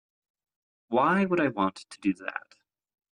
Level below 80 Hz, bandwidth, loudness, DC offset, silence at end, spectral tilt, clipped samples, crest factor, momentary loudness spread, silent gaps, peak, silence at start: -70 dBFS; 10.5 kHz; -27 LUFS; under 0.1%; 0.75 s; -6.5 dB/octave; under 0.1%; 16 dB; 12 LU; none; -12 dBFS; 0.9 s